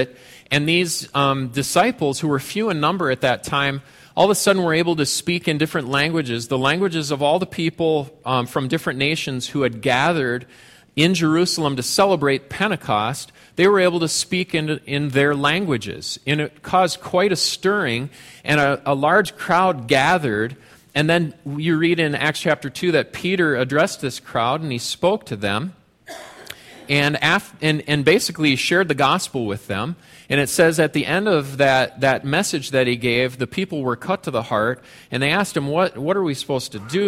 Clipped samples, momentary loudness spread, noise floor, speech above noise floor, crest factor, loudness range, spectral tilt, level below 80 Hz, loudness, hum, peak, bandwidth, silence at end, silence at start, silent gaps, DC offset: under 0.1%; 8 LU; -40 dBFS; 20 dB; 16 dB; 3 LU; -4.5 dB/octave; -54 dBFS; -19 LUFS; none; -4 dBFS; 16 kHz; 0 s; 0 s; none; under 0.1%